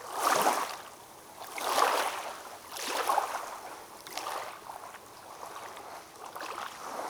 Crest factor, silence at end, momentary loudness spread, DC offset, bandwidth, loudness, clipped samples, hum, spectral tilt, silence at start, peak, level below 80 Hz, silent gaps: 22 dB; 0 s; 19 LU; under 0.1%; over 20 kHz; -33 LUFS; under 0.1%; none; -1 dB/octave; 0 s; -12 dBFS; -76 dBFS; none